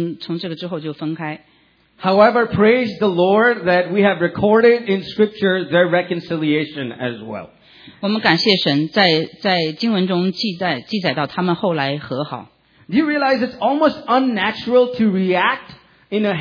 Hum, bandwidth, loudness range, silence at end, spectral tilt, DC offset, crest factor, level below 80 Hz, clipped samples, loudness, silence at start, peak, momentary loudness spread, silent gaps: none; 5.4 kHz; 5 LU; 0 s; -7 dB/octave; under 0.1%; 18 dB; -58 dBFS; under 0.1%; -17 LUFS; 0 s; 0 dBFS; 12 LU; none